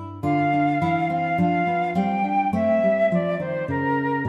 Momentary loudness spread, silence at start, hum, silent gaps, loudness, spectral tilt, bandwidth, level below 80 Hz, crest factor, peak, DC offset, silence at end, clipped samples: 5 LU; 0 s; none; none; -22 LUFS; -8.5 dB/octave; 7.8 kHz; -58 dBFS; 12 dB; -10 dBFS; under 0.1%; 0 s; under 0.1%